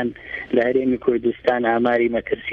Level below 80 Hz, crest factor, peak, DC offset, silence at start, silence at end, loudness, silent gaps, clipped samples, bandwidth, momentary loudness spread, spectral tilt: -52 dBFS; 16 dB; -4 dBFS; under 0.1%; 0 s; 0 s; -20 LUFS; none; under 0.1%; 5.2 kHz; 6 LU; -8 dB/octave